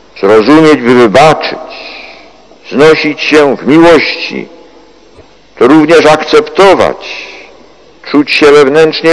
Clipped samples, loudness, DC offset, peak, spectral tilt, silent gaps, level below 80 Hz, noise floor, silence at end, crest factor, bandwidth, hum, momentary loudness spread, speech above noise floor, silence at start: 10%; -6 LUFS; 0.7%; 0 dBFS; -5 dB/octave; none; -40 dBFS; -38 dBFS; 0 s; 6 dB; 11 kHz; none; 18 LU; 33 dB; 0.15 s